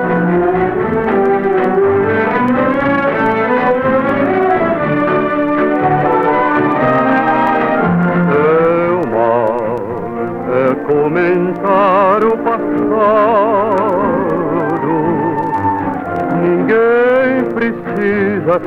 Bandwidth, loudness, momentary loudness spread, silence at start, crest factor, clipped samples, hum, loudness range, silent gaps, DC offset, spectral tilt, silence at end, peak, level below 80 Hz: 6.4 kHz; -13 LUFS; 5 LU; 0 s; 12 dB; under 0.1%; none; 2 LU; none; under 0.1%; -9 dB/octave; 0 s; 0 dBFS; -46 dBFS